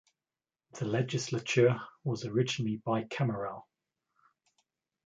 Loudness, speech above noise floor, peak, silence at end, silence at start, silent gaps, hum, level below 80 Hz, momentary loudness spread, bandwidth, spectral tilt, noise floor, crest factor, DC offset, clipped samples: -32 LUFS; over 59 dB; -12 dBFS; 1.45 s; 0.75 s; none; none; -72 dBFS; 13 LU; 9.2 kHz; -5.5 dB/octave; under -90 dBFS; 22 dB; under 0.1%; under 0.1%